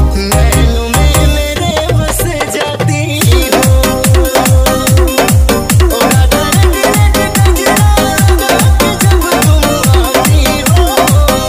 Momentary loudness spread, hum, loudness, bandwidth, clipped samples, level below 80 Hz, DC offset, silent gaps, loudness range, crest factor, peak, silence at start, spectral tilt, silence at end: 4 LU; none; -9 LUFS; 16.5 kHz; under 0.1%; -14 dBFS; under 0.1%; none; 2 LU; 8 dB; 0 dBFS; 0 s; -4.5 dB/octave; 0 s